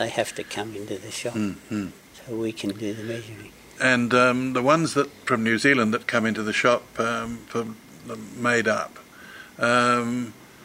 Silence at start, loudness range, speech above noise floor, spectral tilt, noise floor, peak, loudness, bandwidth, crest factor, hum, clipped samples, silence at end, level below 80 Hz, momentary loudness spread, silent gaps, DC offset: 0 s; 9 LU; 20 dB; -4.5 dB/octave; -44 dBFS; -4 dBFS; -24 LUFS; 16 kHz; 22 dB; none; under 0.1%; 0 s; -62 dBFS; 18 LU; none; under 0.1%